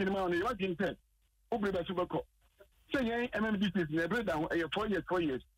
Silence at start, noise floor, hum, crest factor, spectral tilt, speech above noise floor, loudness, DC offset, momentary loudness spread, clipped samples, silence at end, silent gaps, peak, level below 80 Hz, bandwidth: 0 s; -65 dBFS; none; 12 dB; -6.5 dB/octave; 31 dB; -34 LUFS; under 0.1%; 5 LU; under 0.1%; 0.15 s; none; -22 dBFS; -58 dBFS; 16 kHz